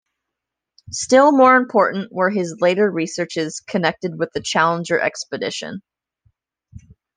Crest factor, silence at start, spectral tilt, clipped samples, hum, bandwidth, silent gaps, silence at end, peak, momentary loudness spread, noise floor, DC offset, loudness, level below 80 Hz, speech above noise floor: 18 dB; 0.9 s; -4.5 dB/octave; under 0.1%; none; 10 kHz; none; 0.4 s; -2 dBFS; 13 LU; -83 dBFS; under 0.1%; -18 LUFS; -60 dBFS; 65 dB